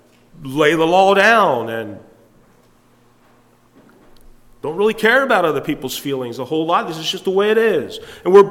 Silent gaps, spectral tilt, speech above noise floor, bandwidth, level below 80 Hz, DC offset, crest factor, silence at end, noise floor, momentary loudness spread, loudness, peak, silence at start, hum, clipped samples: none; -4.5 dB/octave; 37 dB; 16.5 kHz; -54 dBFS; under 0.1%; 16 dB; 0 s; -53 dBFS; 15 LU; -16 LUFS; 0 dBFS; 0.4 s; none; under 0.1%